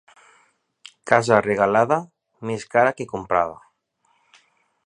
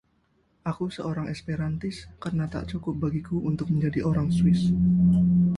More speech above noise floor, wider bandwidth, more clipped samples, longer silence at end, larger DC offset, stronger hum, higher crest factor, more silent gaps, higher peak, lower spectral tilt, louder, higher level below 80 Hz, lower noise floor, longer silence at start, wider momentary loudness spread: first, 47 dB vs 43 dB; about the same, 10.5 kHz vs 10.5 kHz; neither; first, 1.3 s vs 0 s; neither; neither; first, 22 dB vs 14 dB; neither; first, 0 dBFS vs -12 dBFS; second, -5.5 dB/octave vs -8.5 dB/octave; first, -20 LUFS vs -26 LUFS; second, -58 dBFS vs -44 dBFS; about the same, -67 dBFS vs -67 dBFS; first, 1.05 s vs 0.65 s; about the same, 13 LU vs 12 LU